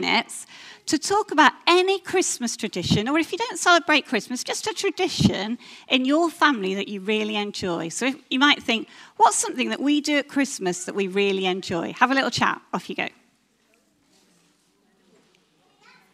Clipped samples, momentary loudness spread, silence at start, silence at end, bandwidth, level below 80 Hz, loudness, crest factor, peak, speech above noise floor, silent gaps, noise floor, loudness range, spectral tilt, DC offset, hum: under 0.1%; 10 LU; 0 s; 3.05 s; 15.5 kHz; -58 dBFS; -22 LUFS; 22 dB; 0 dBFS; 41 dB; none; -64 dBFS; 5 LU; -3.5 dB/octave; under 0.1%; none